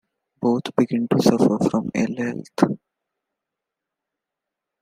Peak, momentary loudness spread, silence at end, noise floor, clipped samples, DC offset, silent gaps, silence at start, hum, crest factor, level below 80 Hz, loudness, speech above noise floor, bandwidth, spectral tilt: -2 dBFS; 9 LU; 2.05 s; -85 dBFS; under 0.1%; under 0.1%; none; 0.4 s; none; 20 dB; -62 dBFS; -21 LUFS; 65 dB; 15.5 kHz; -6.5 dB/octave